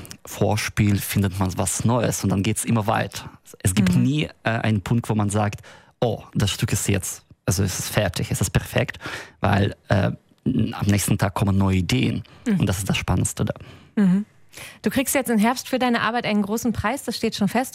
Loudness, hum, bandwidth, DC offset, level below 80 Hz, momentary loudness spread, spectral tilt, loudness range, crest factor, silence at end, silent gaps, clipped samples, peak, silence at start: -22 LUFS; none; 16 kHz; under 0.1%; -44 dBFS; 8 LU; -5 dB/octave; 2 LU; 18 dB; 0.05 s; none; under 0.1%; -4 dBFS; 0 s